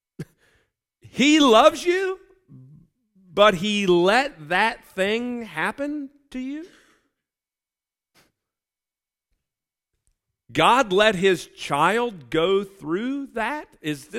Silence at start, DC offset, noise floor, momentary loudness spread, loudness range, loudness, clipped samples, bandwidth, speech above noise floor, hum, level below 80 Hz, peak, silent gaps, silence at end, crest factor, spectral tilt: 0.2 s; under 0.1%; under -90 dBFS; 17 LU; 13 LU; -21 LUFS; under 0.1%; 16 kHz; over 69 dB; none; -56 dBFS; -2 dBFS; none; 0 s; 22 dB; -4 dB/octave